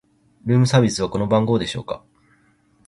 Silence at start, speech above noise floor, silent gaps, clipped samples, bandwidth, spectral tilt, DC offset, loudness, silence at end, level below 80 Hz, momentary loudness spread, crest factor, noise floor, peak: 0.45 s; 40 dB; none; under 0.1%; 11.5 kHz; -6 dB/octave; under 0.1%; -19 LUFS; 0.9 s; -48 dBFS; 16 LU; 18 dB; -59 dBFS; -2 dBFS